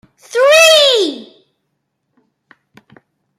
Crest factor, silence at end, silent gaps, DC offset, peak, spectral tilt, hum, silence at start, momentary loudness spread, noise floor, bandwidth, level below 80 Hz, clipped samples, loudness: 14 dB; 2.15 s; none; under 0.1%; 0 dBFS; 0.5 dB/octave; none; 0.35 s; 16 LU; -70 dBFS; 16 kHz; -66 dBFS; under 0.1%; -9 LUFS